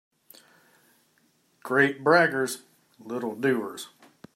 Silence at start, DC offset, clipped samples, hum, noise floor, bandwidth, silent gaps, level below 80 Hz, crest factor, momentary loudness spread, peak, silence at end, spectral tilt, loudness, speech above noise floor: 1.65 s; under 0.1%; under 0.1%; none; -67 dBFS; 16 kHz; none; -78 dBFS; 22 dB; 20 LU; -6 dBFS; 0.5 s; -4.5 dB/octave; -25 LUFS; 42 dB